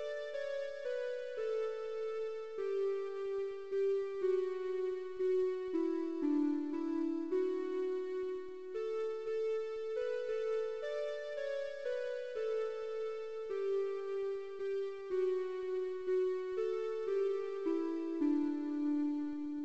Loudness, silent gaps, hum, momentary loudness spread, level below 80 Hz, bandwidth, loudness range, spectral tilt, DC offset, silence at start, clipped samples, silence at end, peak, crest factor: -38 LUFS; none; none; 6 LU; -76 dBFS; 8 kHz; 3 LU; -5 dB/octave; 0.2%; 0 s; under 0.1%; 0 s; -24 dBFS; 12 dB